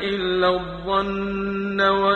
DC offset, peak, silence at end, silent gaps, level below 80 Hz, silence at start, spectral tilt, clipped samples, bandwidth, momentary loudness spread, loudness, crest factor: under 0.1%; -6 dBFS; 0 s; none; -44 dBFS; 0 s; -6.5 dB/octave; under 0.1%; 7 kHz; 6 LU; -22 LUFS; 16 dB